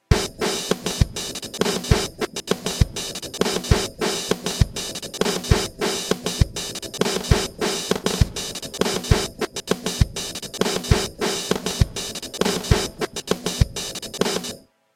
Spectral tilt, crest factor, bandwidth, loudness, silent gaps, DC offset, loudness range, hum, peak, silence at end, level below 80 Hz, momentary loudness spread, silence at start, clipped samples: -4 dB/octave; 22 dB; 17 kHz; -23 LUFS; none; under 0.1%; 1 LU; none; 0 dBFS; 0.35 s; -30 dBFS; 7 LU; 0.1 s; under 0.1%